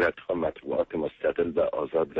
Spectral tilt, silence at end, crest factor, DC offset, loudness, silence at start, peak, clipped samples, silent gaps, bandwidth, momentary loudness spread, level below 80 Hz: -8 dB/octave; 0 s; 14 dB; under 0.1%; -28 LUFS; 0 s; -12 dBFS; under 0.1%; none; 5.6 kHz; 4 LU; -56 dBFS